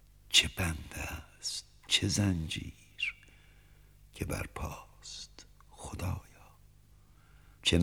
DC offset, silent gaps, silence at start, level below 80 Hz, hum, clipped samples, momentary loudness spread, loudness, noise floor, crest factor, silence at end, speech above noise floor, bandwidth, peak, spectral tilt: under 0.1%; none; 0.25 s; -50 dBFS; 50 Hz at -55 dBFS; under 0.1%; 21 LU; -33 LUFS; -61 dBFS; 26 dB; 0 s; 27 dB; 18 kHz; -8 dBFS; -3 dB/octave